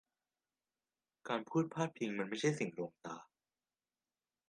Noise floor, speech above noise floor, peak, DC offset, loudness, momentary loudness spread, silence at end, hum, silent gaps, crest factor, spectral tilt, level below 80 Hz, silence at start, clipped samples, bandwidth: under -90 dBFS; over 51 dB; -20 dBFS; under 0.1%; -39 LUFS; 14 LU; 1.25 s; none; none; 22 dB; -5.5 dB/octave; -86 dBFS; 1.25 s; under 0.1%; 10.5 kHz